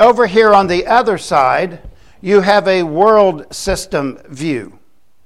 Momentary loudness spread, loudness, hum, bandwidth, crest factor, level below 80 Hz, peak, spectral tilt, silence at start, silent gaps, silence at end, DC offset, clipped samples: 13 LU; -13 LUFS; none; 13 kHz; 14 dB; -40 dBFS; 0 dBFS; -5 dB/octave; 0 s; none; 0.6 s; 0.7%; under 0.1%